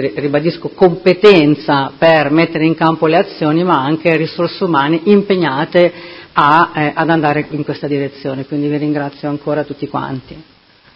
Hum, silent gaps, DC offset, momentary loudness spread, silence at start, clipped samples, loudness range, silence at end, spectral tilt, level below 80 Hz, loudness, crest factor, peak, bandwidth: none; none; under 0.1%; 11 LU; 0 s; 0.2%; 6 LU; 0.55 s; -8 dB/octave; -52 dBFS; -13 LUFS; 14 dB; 0 dBFS; 8 kHz